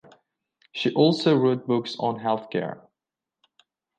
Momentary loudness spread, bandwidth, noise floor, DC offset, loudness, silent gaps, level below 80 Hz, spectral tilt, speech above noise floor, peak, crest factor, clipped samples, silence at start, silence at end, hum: 14 LU; 9.2 kHz; -88 dBFS; under 0.1%; -24 LUFS; none; -72 dBFS; -7 dB/octave; 65 dB; -6 dBFS; 20 dB; under 0.1%; 0.75 s; 1.2 s; none